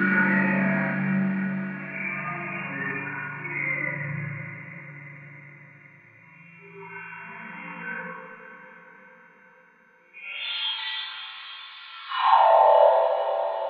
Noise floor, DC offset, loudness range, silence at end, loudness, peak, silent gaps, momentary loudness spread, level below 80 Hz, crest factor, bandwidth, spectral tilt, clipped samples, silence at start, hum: -58 dBFS; under 0.1%; 17 LU; 0 s; -24 LUFS; -6 dBFS; none; 24 LU; -82 dBFS; 20 dB; 5 kHz; -9 dB/octave; under 0.1%; 0 s; none